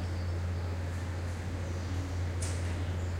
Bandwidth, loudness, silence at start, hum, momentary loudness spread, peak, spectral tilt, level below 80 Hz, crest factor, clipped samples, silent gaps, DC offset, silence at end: 12.5 kHz; -36 LUFS; 0 s; none; 3 LU; -22 dBFS; -6 dB/octave; -48 dBFS; 12 dB; under 0.1%; none; under 0.1%; 0 s